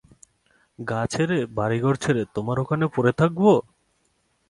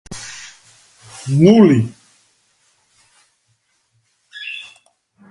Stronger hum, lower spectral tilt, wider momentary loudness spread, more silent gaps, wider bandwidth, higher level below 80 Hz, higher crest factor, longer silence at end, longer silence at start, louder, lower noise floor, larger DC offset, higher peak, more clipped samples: neither; about the same, -7 dB/octave vs -7 dB/octave; second, 8 LU vs 29 LU; neither; about the same, 11.5 kHz vs 11.5 kHz; about the same, -54 dBFS vs -56 dBFS; about the same, 18 dB vs 20 dB; first, 0.9 s vs 0.7 s; first, 0.8 s vs 0.1 s; second, -23 LUFS vs -14 LUFS; first, -68 dBFS vs -64 dBFS; neither; second, -6 dBFS vs 0 dBFS; neither